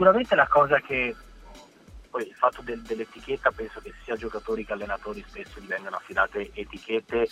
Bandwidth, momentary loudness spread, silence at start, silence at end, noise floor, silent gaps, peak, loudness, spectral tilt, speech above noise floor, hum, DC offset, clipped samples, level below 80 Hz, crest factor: 12 kHz; 18 LU; 0 s; 0.05 s; -49 dBFS; none; -4 dBFS; -26 LUFS; -5.5 dB/octave; 23 dB; none; under 0.1%; under 0.1%; -50 dBFS; 22 dB